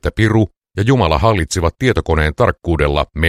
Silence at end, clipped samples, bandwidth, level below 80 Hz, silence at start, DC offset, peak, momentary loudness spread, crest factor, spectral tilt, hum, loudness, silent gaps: 0 s; under 0.1%; 13.5 kHz; -26 dBFS; 0.05 s; under 0.1%; 0 dBFS; 4 LU; 14 dB; -6 dB/octave; none; -15 LUFS; 0.57-0.61 s